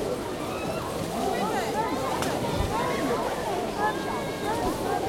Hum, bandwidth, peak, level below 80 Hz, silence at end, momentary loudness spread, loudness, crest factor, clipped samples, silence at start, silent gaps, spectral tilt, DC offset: none; 16.5 kHz; -12 dBFS; -44 dBFS; 0 s; 4 LU; -28 LUFS; 16 dB; under 0.1%; 0 s; none; -4.5 dB/octave; under 0.1%